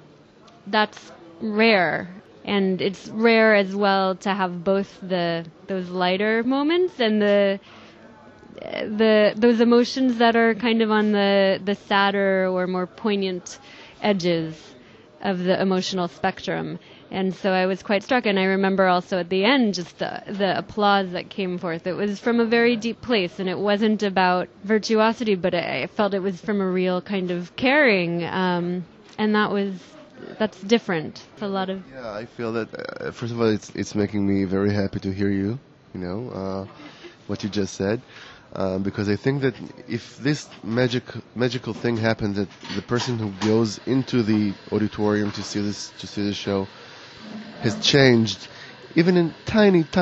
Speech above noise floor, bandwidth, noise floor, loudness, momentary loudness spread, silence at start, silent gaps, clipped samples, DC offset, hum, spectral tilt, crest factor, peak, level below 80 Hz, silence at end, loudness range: 28 dB; 8 kHz; -50 dBFS; -22 LUFS; 14 LU; 0.65 s; none; under 0.1%; under 0.1%; none; -5.5 dB/octave; 20 dB; -2 dBFS; -58 dBFS; 0 s; 7 LU